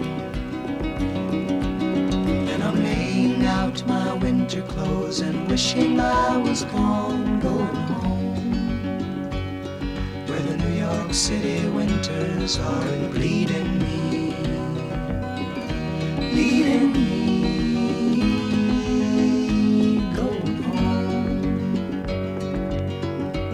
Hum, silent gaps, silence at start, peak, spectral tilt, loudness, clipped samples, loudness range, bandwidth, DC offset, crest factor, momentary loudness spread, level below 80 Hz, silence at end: none; none; 0 s; -8 dBFS; -5.5 dB/octave; -23 LUFS; under 0.1%; 4 LU; 12.5 kHz; under 0.1%; 14 dB; 8 LU; -36 dBFS; 0 s